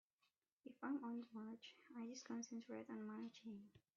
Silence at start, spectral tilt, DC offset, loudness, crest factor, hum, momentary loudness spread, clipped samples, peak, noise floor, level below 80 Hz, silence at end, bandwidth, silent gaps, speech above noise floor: 0.65 s; -4.5 dB/octave; under 0.1%; -53 LUFS; 16 dB; none; 11 LU; under 0.1%; -36 dBFS; -88 dBFS; under -90 dBFS; 0.2 s; 7.2 kHz; none; 36 dB